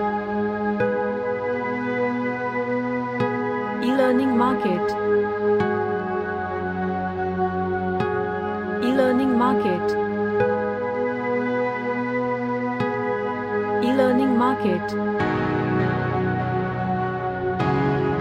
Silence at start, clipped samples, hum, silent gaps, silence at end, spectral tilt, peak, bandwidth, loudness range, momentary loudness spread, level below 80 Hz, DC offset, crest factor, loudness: 0 s; under 0.1%; none; none; 0 s; -8 dB/octave; -6 dBFS; 13 kHz; 3 LU; 6 LU; -52 dBFS; under 0.1%; 16 dB; -23 LUFS